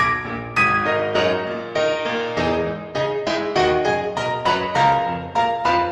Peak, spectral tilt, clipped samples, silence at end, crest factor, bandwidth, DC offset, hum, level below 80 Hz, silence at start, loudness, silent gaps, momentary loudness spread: -4 dBFS; -5 dB/octave; under 0.1%; 0 s; 16 dB; 11.5 kHz; under 0.1%; none; -46 dBFS; 0 s; -20 LUFS; none; 6 LU